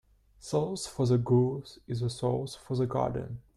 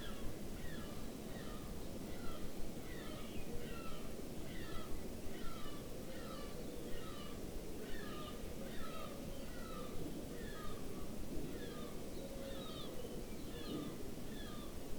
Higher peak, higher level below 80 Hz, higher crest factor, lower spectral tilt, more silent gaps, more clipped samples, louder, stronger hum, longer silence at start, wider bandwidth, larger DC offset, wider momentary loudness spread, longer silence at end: first, -14 dBFS vs -28 dBFS; about the same, -56 dBFS vs -52 dBFS; about the same, 16 dB vs 14 dB; first, -7 dB/octave vs -5 dB/octave; neither; neither; first, -30 LUFS vs -49 LUFS; neither; first, 0.45 s vs 0 s; second, 12 kHz vs over 20 kHz; neither; first, 12 LU vs 2 LU; first, 0.15 s vs 0 s